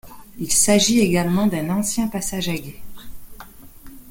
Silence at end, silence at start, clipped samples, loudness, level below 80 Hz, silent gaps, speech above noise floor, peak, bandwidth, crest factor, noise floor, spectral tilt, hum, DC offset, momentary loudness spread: 0 s; 0.05 s; under 0.1%; -19 LUFS; -44 dBFS; none; 22 dB; -2 dBFS; 17 kHz; 18 dB; -41 dBFS; -4 dB/octave; none; under 0.1%; 13 LU